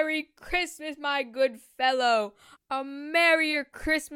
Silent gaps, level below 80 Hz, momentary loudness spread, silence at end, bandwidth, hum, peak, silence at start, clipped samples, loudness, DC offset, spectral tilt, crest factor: none; -52 dBFS; 12 LU; 0 s; 17 kHz; none; -10 dBFS; 0 s; under 0.1%; -26 LUFS; under 0.1%; -2 dB/octave; 18 dB